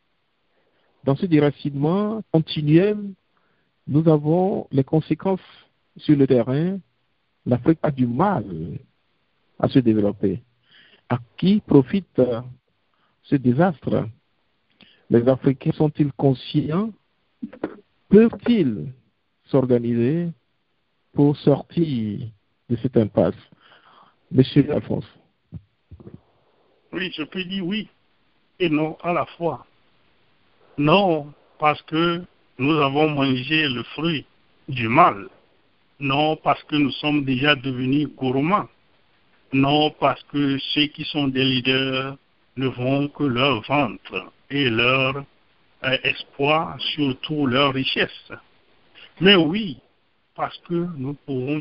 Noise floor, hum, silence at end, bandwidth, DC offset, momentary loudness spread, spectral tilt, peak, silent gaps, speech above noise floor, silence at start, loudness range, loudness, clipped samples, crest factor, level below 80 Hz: -71 dBFS; none; 0 s; 5.6 kHz; under 0.1%; 14 LU; -10.5 dB/octave; -2 dBFS; none; 51 dB; 1.05 s; 4 LU; -21 LUFS; under 0.1%; 20 dB; -54 dBFS